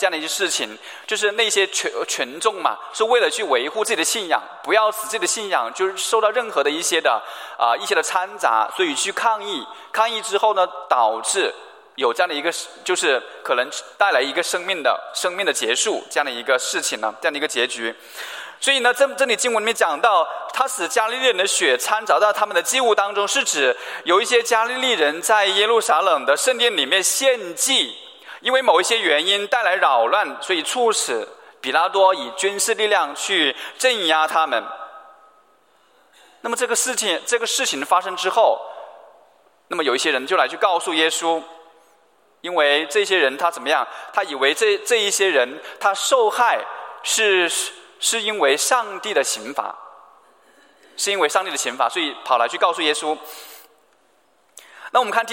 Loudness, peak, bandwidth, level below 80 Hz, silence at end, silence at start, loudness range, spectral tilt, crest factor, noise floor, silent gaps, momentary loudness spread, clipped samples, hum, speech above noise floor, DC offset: -19 LUFS; -2 dBFS; 16.5 kHz; -84 dBFS; 0 s; 0 s; 4 LU; 0 dB/octave; 18 dB; -60 dBFS; none; 8 LU; under 0.1%; none; 40 dB; under 0.1%